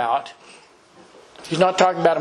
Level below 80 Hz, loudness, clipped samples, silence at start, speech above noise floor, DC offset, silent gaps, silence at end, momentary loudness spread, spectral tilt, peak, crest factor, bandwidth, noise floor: -66 dBFS; -19 LUFS; under 0.1%; 0 s; 30 dB; under 0.1%; none; 0 s; 23 LU; -4.5 dB/octave; 0 dBFS; 22 dB; 11 kHz; -50 dBFS